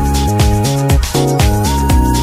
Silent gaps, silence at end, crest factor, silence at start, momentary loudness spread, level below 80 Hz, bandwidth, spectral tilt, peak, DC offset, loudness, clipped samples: none; 0 s; 12 dB; 0 s; 2 LU; -16 dBFS; 16 kHz; -5.5 dB/octave; 0 dBFS; under 0.1%; -13 LUFS; under 0.1%